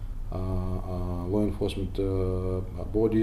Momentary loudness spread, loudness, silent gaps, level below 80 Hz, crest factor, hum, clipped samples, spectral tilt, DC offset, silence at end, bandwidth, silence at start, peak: 6 LU; -30 LUFS; none; -34 dBFS; 14 dB; none; under 0.1%; -8.5 dB/octave; under 0.1%; 0 s; 13 kHz; 0 s; -14 dBFS